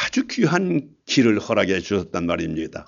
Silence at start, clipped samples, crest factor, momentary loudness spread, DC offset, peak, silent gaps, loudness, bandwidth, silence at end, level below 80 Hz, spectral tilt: 0 s; under 0.1%; 18 dB; 7 LU; under 0.1%; -4 dBFS; none; -21 LUFS; 7.6 kHz; 0.05 s; -52 dBFS; -5 dB/octave